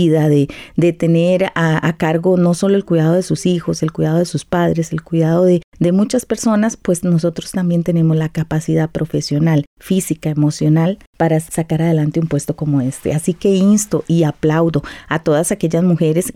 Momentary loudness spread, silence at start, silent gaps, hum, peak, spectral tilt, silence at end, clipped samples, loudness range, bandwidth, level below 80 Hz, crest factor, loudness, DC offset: 6 LU; 0 s; 5.64-5.72 s, 9.67-9.77 s, 11.07-11.13 s; none; -4 dBFS; -6.5 dB/octave; 0.05 s; under 0.1%; 2 LU; 15 kHz; -46 dBFS; 10 dB; -16 LUFS; under 0.1%